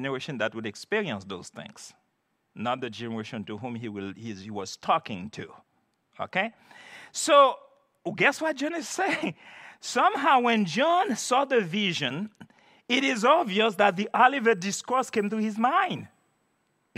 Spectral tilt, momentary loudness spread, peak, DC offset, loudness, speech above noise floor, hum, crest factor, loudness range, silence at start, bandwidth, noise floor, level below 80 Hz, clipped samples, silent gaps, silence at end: -3.5 dB/octave; 18 LU; -6 dBFS; under 0.1%; -26 LUFS; 48 dB; none; 20 dB; 10 LU; 0 s; 15.5 kHz; -75 dBFS; -80 dBFS; under 0.1%; none; 0.9 s